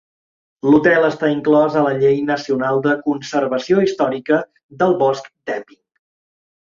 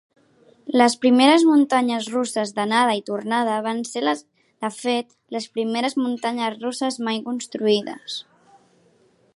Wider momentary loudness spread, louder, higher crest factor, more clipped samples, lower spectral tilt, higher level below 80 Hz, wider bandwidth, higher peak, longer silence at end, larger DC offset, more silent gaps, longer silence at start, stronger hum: second, 11 LU vs 15 LU; first, -17 LUFS vs -21 LUFS; about the same, 16 dB vs 18 dB; neither; first, -6.5 dB/octave vs -3.5 dB/octave; first, -60 dBFS vs -76 dBFS; second, 7.4 kHz vs 11.5 kHz; about the same, -2 dBFS vs -2 dBFS; second, 1 s vs 1.15 s; neither; first, 4.63-4.69 s vs none; about the same, 0.65 s vs 0.65 s; neither